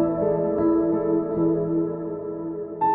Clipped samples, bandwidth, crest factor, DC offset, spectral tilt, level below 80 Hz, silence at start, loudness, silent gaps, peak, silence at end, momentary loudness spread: under 0.1%; 2.8 kHz; 12 dB; under 0.1%; -11 dB/octave; -52 dBFS; 0 s; -24 LUFS; none; -10 dBFS; 0 s; 10 LU